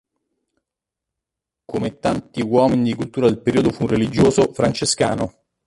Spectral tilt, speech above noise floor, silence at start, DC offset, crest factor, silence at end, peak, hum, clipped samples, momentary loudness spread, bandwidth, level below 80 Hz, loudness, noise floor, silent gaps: -5.5 dB/octave; 66 dB; 1.7 s; under 0.1%; 18 dB; 0.35 s; -2 dBFS; none; under 0.1%; 10 LU; 11.5 kHz; -46 dBFS; -19 LUFS; -85 dBFS; none